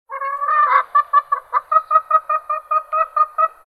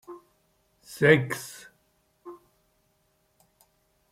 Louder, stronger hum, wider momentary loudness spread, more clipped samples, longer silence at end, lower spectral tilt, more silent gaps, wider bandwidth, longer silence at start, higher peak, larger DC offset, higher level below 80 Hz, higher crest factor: first, -17 LUFS vs -23 LUFS; neither; second, 7 LU vs 28 LU; neither; second, 0.2 s vs 1.8 s; second, -1 dB/octave vs -5.5 dB/octave; neither; second, 12 kHz vs 16 kHz; about the same, 0.1 s vs 0.1 s; first, -2 dBFS vs -6 dBFS; neither; about the same, -68 dBFS vs -68 dBFS; second, 16 dB vs 26 dB